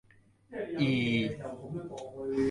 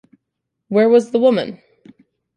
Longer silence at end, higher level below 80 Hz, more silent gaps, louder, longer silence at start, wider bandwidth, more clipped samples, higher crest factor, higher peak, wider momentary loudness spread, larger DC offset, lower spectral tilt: second, 0 s vs 0.8 s; first, -62 dBFS vs -68 dBFS; neither; second, -33 LUFS vs -15 LUFS; second, 0.5 s vs 0.7 s; first, 11.5 kHz vs 9.8 kHz; neither; about the same, 18 dB vs 16 dB; second, -14 dBFS vs -2 dBFS; first, 13 LU vs 9 LU; neither; about the same, -7 dB/octave vs -6.5 dB/octave